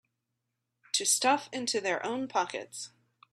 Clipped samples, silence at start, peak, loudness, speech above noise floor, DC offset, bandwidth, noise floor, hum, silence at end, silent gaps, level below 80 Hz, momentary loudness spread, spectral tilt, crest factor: under 0.1%; 0.95 s; -12 dBFS; -29 LUFS; 53 dB; under 0.1%; 15.5 kHz; -84 dBFS; none; 0.45 s; none; -82 dBFS; 16 LU; -0.5 dB/octave; 22 dB